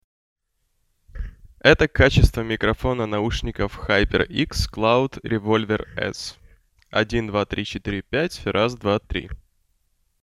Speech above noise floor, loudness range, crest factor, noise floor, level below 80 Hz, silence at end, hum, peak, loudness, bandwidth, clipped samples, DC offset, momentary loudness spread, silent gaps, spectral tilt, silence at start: 49 dB; 5 LU; 22 dB; -70 dBFS; -32 dBFS; 0.85 s; none; 0 dBFS; -22 LUFS; 14 kHz; under 0.1%; under 0.1%; 14 LU; none; -5.5 dB/octave; 1.15 s